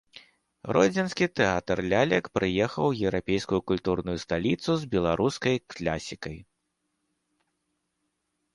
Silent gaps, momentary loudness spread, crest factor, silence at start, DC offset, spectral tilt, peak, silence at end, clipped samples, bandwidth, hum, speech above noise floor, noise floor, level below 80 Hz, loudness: none; 8 LU; 20 dB; 0.15 s; under 0.1%; -5.5 dB/octave; -8 dBFS; 2.15 s; under 0.1%; 11.5 kHz; none; 52 dB; -79 dBFS; -52 dBFS; -27 LUFS